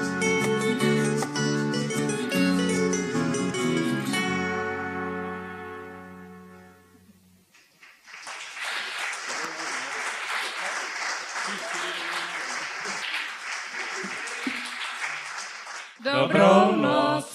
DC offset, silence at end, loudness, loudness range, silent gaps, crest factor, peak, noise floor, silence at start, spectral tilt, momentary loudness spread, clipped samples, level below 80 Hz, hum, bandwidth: under 0.1%; 0 s; -26 LUFS; 11 LU; none; 22 dB; -4 dBFS; -58 dBFS; 0 s; -4 dB/octave; 14 LU; under 0.1%; -66 dBFS; none; 14.5 kHz